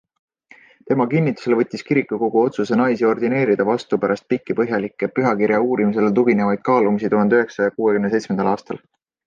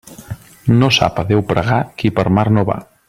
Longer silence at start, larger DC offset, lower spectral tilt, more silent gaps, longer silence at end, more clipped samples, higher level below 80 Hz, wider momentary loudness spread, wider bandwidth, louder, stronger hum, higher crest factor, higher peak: first, 0.85 s vs 0.1 s; neither; first, -8 dB/octave vs -6 dB/octave; neither; first, 0.5 s vs 0.25 s; neither; second, -62 dBFS vs -42 dBFS; second, 5 LU vs 14 LU; second, 7.6 kHz vs 15 kHz; second, -19 LUFS vs -15 LUFS; neither; about the same, 14 dB vs 16 dB; second, -4 dBFS vs 0 dBFS